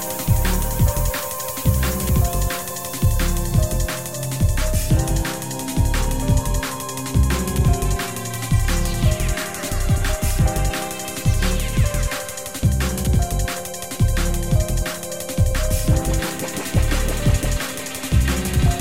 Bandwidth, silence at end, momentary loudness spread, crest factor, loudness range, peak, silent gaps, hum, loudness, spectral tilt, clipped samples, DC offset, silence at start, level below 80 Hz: 16.5 kHz; 0 s; 6 LU; 14 dB; 1 LU; -4 dBFS; none; none; -21 LUFS; -5 dB/octave; under 0.1%; 0.9%; 0 s; -22 dBFS